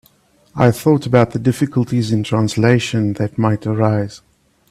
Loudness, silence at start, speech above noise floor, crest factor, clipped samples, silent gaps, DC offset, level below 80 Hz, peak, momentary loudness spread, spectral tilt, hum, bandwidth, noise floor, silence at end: -16 LUFS; 0.55 s; 39 dB; 16 dB; under 0.1%; none; under 0.1%; -50 dBFS; 0 dBFS; 6 LU; -7 dB/octave; none; 14 kHz; -54 dBFS; 0.55 s